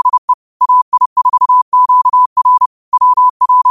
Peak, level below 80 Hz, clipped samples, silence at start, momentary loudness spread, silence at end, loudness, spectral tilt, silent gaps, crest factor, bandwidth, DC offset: -4 dBFS; -62 dBFS; under 0.1%; 0.05 s; 5 LU; 0 s; -10 LUFS; -1.5 dB/octave; 0.18-0.28 s, 0.34-0.60 s, 0.82-0.92 s, 1.06-1.16 s, 1.62-1.72 s, 2.26-2.36 s, 2.66-2.92 s, 3.30-3.40 s; 6 dB; 1.4 kHz; 0.3%